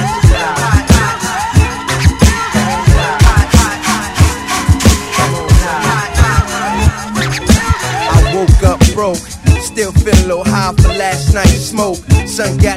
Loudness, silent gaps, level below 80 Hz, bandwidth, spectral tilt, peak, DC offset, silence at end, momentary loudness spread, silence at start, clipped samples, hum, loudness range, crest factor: -11 LUFS; none; -16 dBFS; 16 kHz; -5 dB/octave; 0 dBFS; under 0.1%; 0 s; 5 LU; 0 s; 1%; none; 1 LU; 10 dB